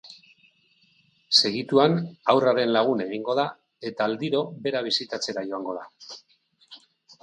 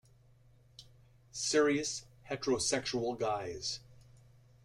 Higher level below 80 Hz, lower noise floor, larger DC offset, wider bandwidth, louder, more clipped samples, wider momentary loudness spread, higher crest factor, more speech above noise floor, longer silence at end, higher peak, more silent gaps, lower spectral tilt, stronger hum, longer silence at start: second, -74 dBFS vs -64 dBFS; about the same, -63 dBFS vs -63 dBFS; neither; second, 10.5 kHz vs 13.5 kHz; first, -24 LUFS vs -34 LUFS; neither; first, 17 LU vs 14 LU; about the same, 24 dB vs 20 dB; first, 39 dB vs 30 dB; second, 0.45 s vs 0.7 s; first, -2 dBFS vs -16 dBFS; neither; first, -4.5 dB/octave vs -3 dB/octave; neither; second, 0.05 s vs 0.8 s